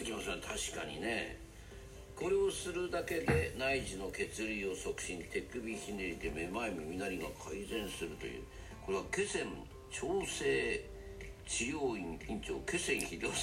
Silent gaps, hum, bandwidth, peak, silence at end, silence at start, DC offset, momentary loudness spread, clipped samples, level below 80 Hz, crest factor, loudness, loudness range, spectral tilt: none; none; 16 kHz; -18 dBFS; 0 s; 0 s; under 0.1%; 14 LU; under 0.1%; -54 dBFS; 20 dB; -38 LUFS; 4 LU; -3.5 dB/octave